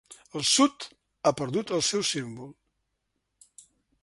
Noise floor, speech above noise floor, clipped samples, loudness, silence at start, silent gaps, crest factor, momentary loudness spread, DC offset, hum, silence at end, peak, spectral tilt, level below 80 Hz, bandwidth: -79 dBFS; 53 dB; under 0.1%; -26 LUFS; 0.1 s; none; 20 dB; 21 LU; under 0.1%; none; 1.5 s; -10 dBFS; -3 dB/octave; -68 dBFS; 11.5 kHz